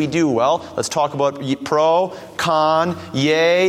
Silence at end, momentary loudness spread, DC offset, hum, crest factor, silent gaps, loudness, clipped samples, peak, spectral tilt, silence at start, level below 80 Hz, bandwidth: 0 s; 7 LU; under 0.1%; none; 14 dB; none; -18 LUFS; under 0.1%; -4 dBFS; -4.5 dB/octave; 0 s; -58 dBFS; 15.5 kHz